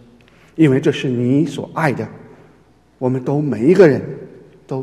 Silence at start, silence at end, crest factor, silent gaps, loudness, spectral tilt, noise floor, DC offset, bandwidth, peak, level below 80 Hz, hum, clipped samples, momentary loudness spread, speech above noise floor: 0.55 s; 0 s; 18 dB; none; -16 LUFS; -7.5 dB/octave; -51 dBFS; under 0.1%; 12 kHz; 0 dBFS; -56 dBFS; none; under 0.1%; 18 LU; 36 dB